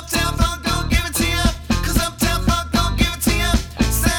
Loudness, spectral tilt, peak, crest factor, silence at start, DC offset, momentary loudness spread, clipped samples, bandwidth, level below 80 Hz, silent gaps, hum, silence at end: -19 LUFS; -4 dB/octave; -2 dBFS; 16 dB; 0 s; under 0.1%; 3 LU; under 0.1%; 19.5 kHz; -24 dBFS; none; none; 0 s